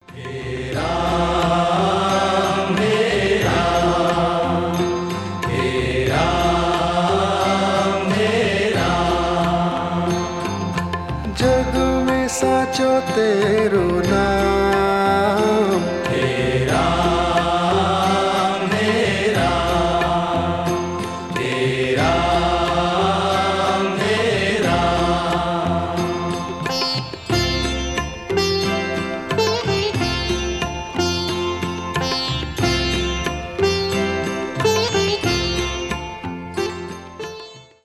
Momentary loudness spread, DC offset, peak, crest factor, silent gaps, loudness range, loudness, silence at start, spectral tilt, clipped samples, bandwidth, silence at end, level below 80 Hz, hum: 7 LU; under 0.1%; -4 dBFS; 14 dB; none; 4 LU; -19 LUFS; 0.1 s; -5 dB/octave; under 0.1%; 14.5 kHz; 0.2 s; -34 dBFS; none